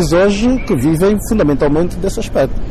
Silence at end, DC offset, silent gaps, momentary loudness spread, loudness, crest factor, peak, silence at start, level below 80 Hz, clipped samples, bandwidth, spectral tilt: 0 s; under 0.1%; none; 5 LU; -14 LUFS; 8 dB; -6 dBFS; 0 s; -24 dBFS; under 0.1%; 14 kHz; -6.5 dB/octave